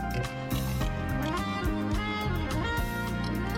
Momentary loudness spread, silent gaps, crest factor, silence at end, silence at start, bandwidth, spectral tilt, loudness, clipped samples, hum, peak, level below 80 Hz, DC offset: 2 LU; none; 10 dB; 0 s; 0 s; 17 kHz; -6 dB/octave; -31 LUFS; under 0.1%; none; -20 dBFS; -36 dBFS; under 0.1%